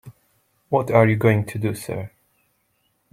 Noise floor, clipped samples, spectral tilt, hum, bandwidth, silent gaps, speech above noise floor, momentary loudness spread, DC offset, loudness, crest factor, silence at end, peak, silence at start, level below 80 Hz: -68 dBFS; under 0.1%; -7.5 dB/octave; none; 15.5 kHz; none; 49 dB; 15 LU; under 0.1%; -21 LUFS; 20 dB; 1.05 s; -2 dBFS; 0.05 s; -56 dBFS